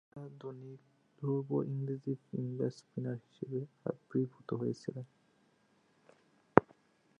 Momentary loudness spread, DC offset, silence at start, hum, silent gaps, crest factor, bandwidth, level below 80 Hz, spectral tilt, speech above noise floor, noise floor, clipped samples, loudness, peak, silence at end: 19 LU; under 0.1%; 0.15 s; none; none; 36 dB; 9.4 kHz; -70 dBFS; -9 dB/octave; 33 dB; -72 dBFS; under 0.1%; -37 LUFS; -2 dBFS; 0.6 s